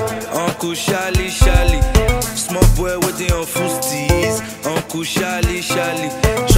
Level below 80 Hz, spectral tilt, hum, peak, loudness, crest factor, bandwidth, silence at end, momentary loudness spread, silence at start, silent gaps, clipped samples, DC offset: -20 dBFS; -4.5 dB/octave; none; 0 dBFS; -17 LUFS; 16 dB; 16.5 kHz; 0 s; 5 LU; 0 s; none; under 0.1%; under 0.1%